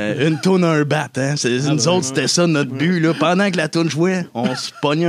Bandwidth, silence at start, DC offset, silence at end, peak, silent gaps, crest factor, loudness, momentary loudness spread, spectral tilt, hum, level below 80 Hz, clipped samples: 14 kHz; 0 s; under 0.1%; 0 s; -2 dBFS; none; 16 dB; -17 LUFS; 5 LU; -5 dB/octave; none; -68 dBFS; under 0.1%